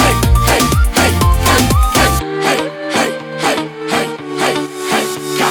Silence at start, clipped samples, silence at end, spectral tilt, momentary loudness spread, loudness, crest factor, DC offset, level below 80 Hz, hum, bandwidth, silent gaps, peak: 0 s; under 0.1%; 0 s; -4 dB/octave; 7 LU; -14 LUFS; 14 dB; under 0.1%; -20 dBFS; none; over 20 kHz; none; 0 dBFS